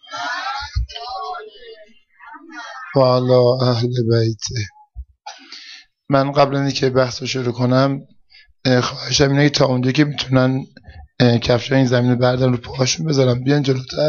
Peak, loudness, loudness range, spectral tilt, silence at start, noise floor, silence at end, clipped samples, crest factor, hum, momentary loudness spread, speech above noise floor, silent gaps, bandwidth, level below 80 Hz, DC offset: -2 dBFS; -17 LUFS; 4 LU; -5.5 dB/octave; 0.1 s; -50 dBFS; 0 s; under 0.1%; 16 dB; none; 18 LU; 34 dB; none; 7.2 kHz; -40 dBFS; under 0.1%